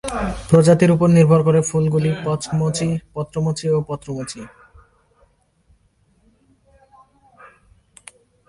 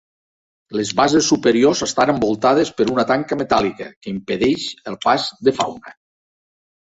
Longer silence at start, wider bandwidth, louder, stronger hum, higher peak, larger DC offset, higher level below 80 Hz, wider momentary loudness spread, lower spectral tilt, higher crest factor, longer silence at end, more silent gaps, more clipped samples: second, 0.05 s vs 0.7 s; first, 11.5 kHz vs 8.2 kHz; about the same, -17 LUFS vs -18 LUFS; neither; about the same, 0 dBFS vs -2 dBFS; neither; first, -44 dBFS vs -52 dBFS; first, 15 LU vs 12 LU; first, -7 dB/octave vs -4 dB/octave; about the same, 20 dB vs 18 dB; first, 4 s vs 0.95 s; second, none vs 3.96-4.01 s; neither